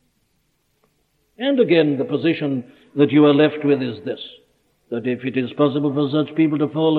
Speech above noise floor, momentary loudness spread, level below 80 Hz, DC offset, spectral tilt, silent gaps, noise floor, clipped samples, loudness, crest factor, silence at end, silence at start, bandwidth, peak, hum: 48 dB; 15 LU; -68 dBFS; under 0.1%; -9.5 dB/octave; none; -66 dBFS; under 0.1%; -19 LUFS; 16 dB; 0 s; 1.4 s; 4.5 kHz; -2 dBFS; none